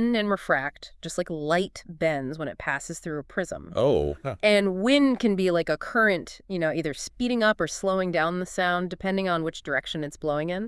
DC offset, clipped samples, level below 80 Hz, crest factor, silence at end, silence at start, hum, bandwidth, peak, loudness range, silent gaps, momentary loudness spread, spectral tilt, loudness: under 0.1%; under 0.1%; -50 dBFS; 18 dB; 0 s; 0 s; none; 12 kHz; -8 dBFS; 5 LU; none; 10 LU; -5 dB/octave; -26 LUFS